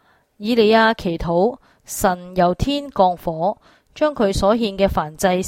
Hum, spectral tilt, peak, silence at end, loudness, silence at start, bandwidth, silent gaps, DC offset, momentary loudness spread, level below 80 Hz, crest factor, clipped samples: none; -5 dB/octave; -2 dBFS; 0 s; -19 LUFS; 0.4 s; 16.5 kHz; none; under 0.1%; 9 LU; -38 dBFS; 16 dB; under 0.1%